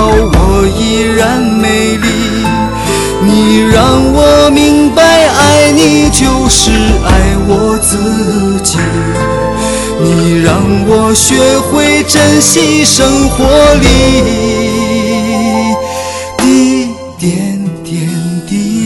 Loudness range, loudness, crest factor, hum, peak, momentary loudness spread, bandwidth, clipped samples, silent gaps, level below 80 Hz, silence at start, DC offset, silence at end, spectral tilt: 5 LU; -8 LUFS; 8 dB; none; 0 dBFS; 8 LU; over 20 kHz; 2%; none; -20 dBFS; 0 s; under 0.1%; 0 s; -4 dB/octave